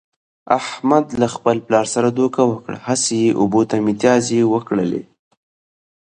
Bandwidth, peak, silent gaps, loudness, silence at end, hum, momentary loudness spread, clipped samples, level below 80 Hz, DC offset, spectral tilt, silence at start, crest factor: 9.8 kHz; 0 dBFS; none; -17 LUFS; 1.1 s; none; 5 LU; under 0.1%; -56 dBFS; under 0.1%; -5 dB/octave; 0.45 s; 18 dB